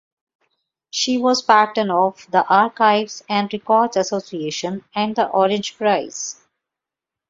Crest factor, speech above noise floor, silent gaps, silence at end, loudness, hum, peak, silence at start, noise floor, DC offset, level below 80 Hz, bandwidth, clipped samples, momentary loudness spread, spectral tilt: 18 dB; 68 dB; none; 0.95 s; -19 LUFS; none; -2 dBFS; 0.95 s; -87 dBFS; under 0.1%; -66 dBFS; 7.8 kHz; under 0.1%; 11 LU; -3.5 dB/octave